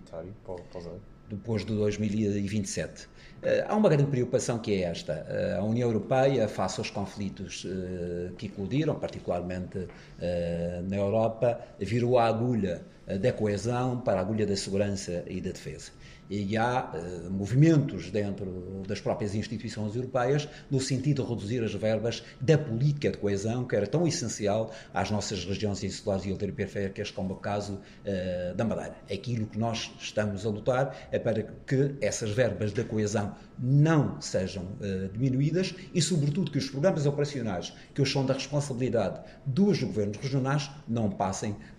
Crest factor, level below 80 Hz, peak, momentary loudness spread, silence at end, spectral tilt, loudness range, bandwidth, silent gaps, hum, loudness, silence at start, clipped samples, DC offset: 18 dB; -54 dBFS; -10 dBFS; 11 LU; 0 s; -6 dB/octave; 5 LU; 11.5 kHz; none; none; -29 LUFS; 0 s; under 0.1%; under 0.1%